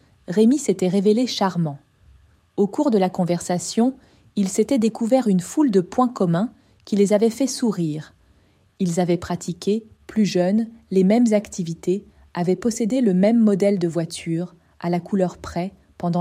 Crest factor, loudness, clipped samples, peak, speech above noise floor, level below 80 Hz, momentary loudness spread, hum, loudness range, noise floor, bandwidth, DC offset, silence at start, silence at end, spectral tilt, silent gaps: 16 dB; -21 LUFS; under 0.1%; -6 dBFS; 38 dB; -56 dBFS; 11 LU; none; 3 LU; -58 dBFS; 15 kHz; under 0.1%; 0.3 s; 0 s; -6.5 dB/octave; none